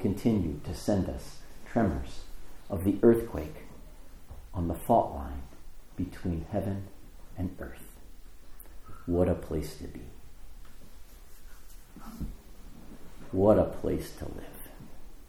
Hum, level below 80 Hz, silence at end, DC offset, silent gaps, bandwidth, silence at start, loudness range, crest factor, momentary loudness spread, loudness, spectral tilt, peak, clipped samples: none; -44 dBFS; 0 s; under 0.1%; none; over 20 kHz; 0 s; 9 LU; 24 dB; 27 LU; -30 LUFS; -7.5 dB/octave; -8 dBFS; under 0.1%